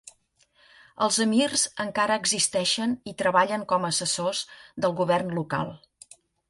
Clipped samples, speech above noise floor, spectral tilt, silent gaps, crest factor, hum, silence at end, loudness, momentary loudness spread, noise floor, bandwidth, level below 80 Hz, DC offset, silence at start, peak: under 0.1%; 39 dB; -3 dB/octave; none; 20 dB; none; 0.7 s; -25 LUFS; 8 LU; -65 dBFS; 11.5 kHz; -66 dBFS; under 0.1%; 0.05 s; -6 dBFS